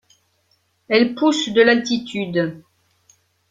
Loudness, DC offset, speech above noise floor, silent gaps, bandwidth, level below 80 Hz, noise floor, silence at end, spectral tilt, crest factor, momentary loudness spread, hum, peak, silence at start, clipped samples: -18 LUFS; under 0.1%; 47 dB; none; 9.2 kHz; -62 dBFS; -64 dBFS; 0.9 s; -4.5 dB/octave; 18 dB; 9 LU; none; -2 dBFS; 0.9 s; under 0.1%